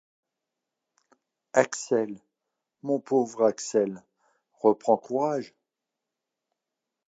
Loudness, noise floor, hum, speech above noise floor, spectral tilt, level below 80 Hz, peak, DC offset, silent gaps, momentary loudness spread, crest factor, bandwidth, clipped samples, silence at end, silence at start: -26 LUFS; -87 dBFS; none; 61 dB; -5 dB/octave; -82 dBFS; -6 dBFS; under 0.1%; none; 13 LU; 24 dB; 9 kHz; under 0.1%; 1.6 s; 1.55 s